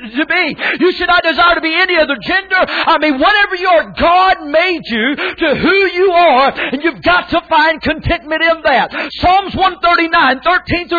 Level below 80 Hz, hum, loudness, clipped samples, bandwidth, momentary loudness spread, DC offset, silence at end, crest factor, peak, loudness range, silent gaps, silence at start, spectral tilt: -36 dBFS; none; -11 LUFS; under 0.1%; 5 kHz; 5 LU; under 0.1%; 0 s; 10 dB; -2 dBFS; 1 LU; none; 0 s; -6 dB/octave